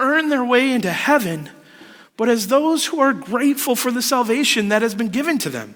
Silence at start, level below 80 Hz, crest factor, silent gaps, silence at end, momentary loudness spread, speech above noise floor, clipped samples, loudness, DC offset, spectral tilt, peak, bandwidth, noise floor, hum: 0 s; -64 dBFS; 16 dB; none; 0 s; 5 LU; 26 dB; under 0.1%; -18 LUFS; under 0.1%; -3.5 dB/octave; -2 dBFS; over 20 kHz; -44 dBFS; none